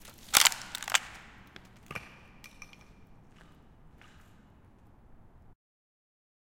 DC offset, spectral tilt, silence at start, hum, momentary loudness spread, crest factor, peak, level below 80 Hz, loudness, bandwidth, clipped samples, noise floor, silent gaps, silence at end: under 0.1%; 1 dB/octave; 0.05 s; none; 30 LU; 36 dB; 0 dBFS; -60 dBFS; -26 LUFS; 17 kHz; under 0.1%; -58 dBFS; none; 3.9 s